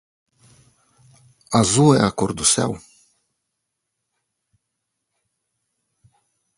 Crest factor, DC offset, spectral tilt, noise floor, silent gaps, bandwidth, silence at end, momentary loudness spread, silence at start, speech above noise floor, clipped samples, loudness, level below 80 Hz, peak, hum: 24 dB; under 0.1%; -4.5 dB/octave; -79 dBFS; none; 11.5 kHz; 3.8 s; 10 LU; 1.5 s; 61 dB; under 0.1%; -17 LUFS; -52 dBFS; 0 dBFS; none